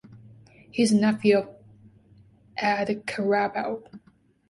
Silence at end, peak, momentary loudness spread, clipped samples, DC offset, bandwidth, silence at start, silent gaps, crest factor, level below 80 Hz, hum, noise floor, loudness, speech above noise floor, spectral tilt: 0.5 s; -8 dBFS; 15 LU; under 0.1%; under 0.1%; 11.5 kHz; 0.1 s; none; 18 dB; -66 dBFS; none; -56 dBFS; -24 LUFS; 32 dB; -5.5 dB/octave